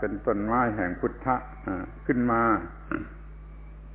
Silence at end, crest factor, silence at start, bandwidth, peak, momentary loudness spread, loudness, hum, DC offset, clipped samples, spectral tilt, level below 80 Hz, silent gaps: 0 s; 18 dB; 0 s; 3.7 kHz; -10 dBFS; 22 LU; -28 LUFS; none; under 0.1%; under 0.1%; -8 dB/octave; -44 dBFS; none